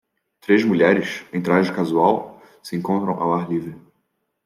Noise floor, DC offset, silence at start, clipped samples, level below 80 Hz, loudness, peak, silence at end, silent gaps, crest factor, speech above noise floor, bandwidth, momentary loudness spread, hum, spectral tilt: -72 dBFS; under 0.1%; 0.5 s; under 0.1%; -66 dBFS; -20 LUFS; -4 dBFS; 0.65 s; none; 18 dB; 53 dB; 14.5 kHz; 17 LU; none; -7 dB/octave